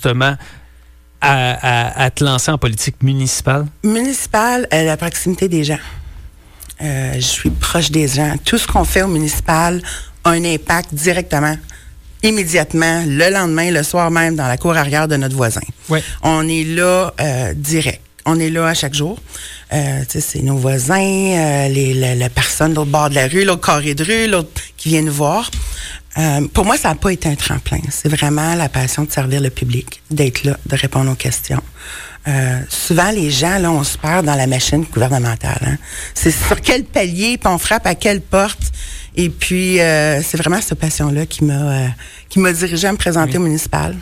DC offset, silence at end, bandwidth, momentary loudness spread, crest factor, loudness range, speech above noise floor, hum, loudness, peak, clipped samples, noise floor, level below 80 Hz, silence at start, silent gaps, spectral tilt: under 0.1%; 0 s; 16.5 kHz; 7 LU; 14 dB; 3 LU; 28 dB; none; -15 LUFS; -2 dBFS; under 0.1%; -43 dBFS; -30 dBFS; 0 s; none; -4.5 dB/octave